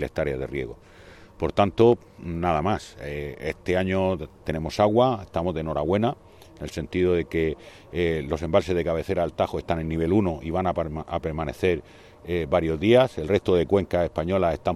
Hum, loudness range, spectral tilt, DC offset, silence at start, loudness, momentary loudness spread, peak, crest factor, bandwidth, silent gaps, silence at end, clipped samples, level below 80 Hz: none; 3 LU; -7 dB/octave; under 0.1%; 0 s; -25 LUFS; 12 LU; -6 dBFS; 18 dB; 13.5 kHz; none; 0 s; under 0.1%; -46 dBFS